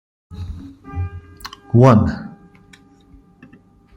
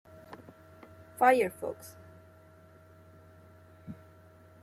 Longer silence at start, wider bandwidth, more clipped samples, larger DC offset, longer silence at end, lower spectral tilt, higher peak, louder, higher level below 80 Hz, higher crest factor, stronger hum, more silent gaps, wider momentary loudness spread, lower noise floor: about the same, 0.3 s vs 0.3 s; about the same, 16 kHz vs 15.5 kHz; neither; neither; first, 1.7 s vs 0.7 s; first, -8.5 dB/octave vs -5 dB/octave; first, -2 dBFS vs -10 dBFS; first, -16 LUFS vs -28 LUFS; first, -42 dBFS vs -74 dBFS; second, 18 dB vs 24 dB; neither; neither; second, 24 LU vs 29 LU; second, -48 dBFS vs -57 dBFS